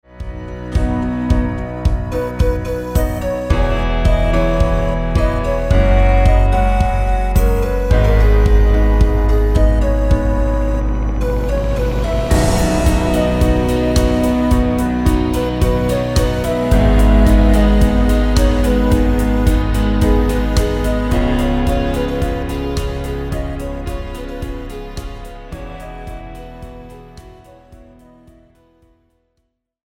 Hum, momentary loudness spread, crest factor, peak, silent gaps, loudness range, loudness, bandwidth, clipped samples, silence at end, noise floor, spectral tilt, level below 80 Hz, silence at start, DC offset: none; 15 LU; 14 dB; 0 dBFS; none; 14 LU; -16 LUFS; 16 kHz; under 0.1%; 2.2 s; -69 dBFS; -7 dB/octave; -16 dBFS; 0.15 s; under 0.1%